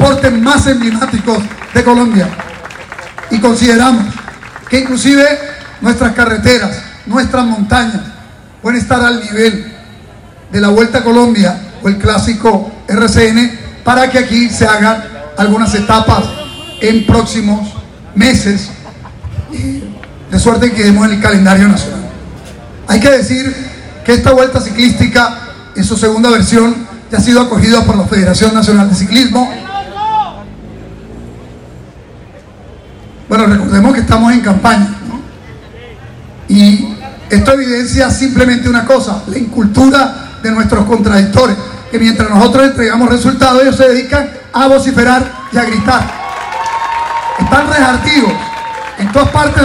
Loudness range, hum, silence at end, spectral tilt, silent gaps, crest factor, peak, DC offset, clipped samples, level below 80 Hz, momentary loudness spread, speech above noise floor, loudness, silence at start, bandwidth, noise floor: 4 LU; none; 0 s; -5 dB/octave; none; 10 dB; 0 dBFS; under 0.1%; 2%; -28 dBFS; 16 LU; 26 dB; -9 LUFS; 0 s; 13.5 kHz; -34 dBFS